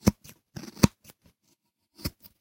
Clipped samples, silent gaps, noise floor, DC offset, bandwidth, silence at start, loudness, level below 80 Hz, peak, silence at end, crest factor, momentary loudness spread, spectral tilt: under 0.1%; none; -72 dBFS; under 0.1%; 16.5 kHz; 0.05 s; -29 LUFS; -46 dBFS; 0 dBFS; 0.3 s; 30 dB; 20 LU; -5.5 dB/octave